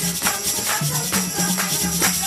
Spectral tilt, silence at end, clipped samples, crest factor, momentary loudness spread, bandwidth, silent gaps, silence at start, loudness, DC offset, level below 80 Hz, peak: -2 dB/octave; 0 s; under 0.1%; 16 dB; 2 LU; 15.5 kHz; none; 0 s; -19 LUFS; under 0.1%; -46 dBFS; -6 dBFS